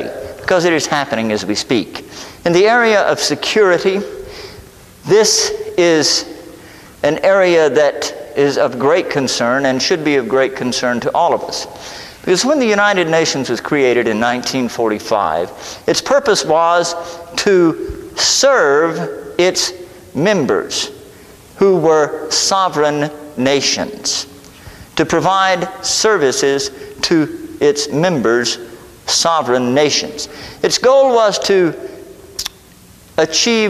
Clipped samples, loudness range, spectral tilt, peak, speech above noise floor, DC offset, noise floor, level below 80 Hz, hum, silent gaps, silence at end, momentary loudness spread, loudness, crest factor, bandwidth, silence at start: under 0.1%; 2 LU; -3 dB/octave; 0 dBFS; 28 dB; under 0.1%; -42 dBFS; -48 dBFS; none; none; 0 s; 14 LU; -14 LUFS; 14 dB; 15 kHz; 0 s